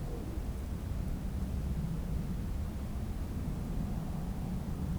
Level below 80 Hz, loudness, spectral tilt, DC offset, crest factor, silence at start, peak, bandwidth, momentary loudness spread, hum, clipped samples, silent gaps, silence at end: -38 dBFS; -38 LUFS; -7.5 dB/octave; under 0.1%; 12 dB; 0 s; -24 dBFS; over 20 kHz; 3 LU; none; under 0.1%; none; 0 s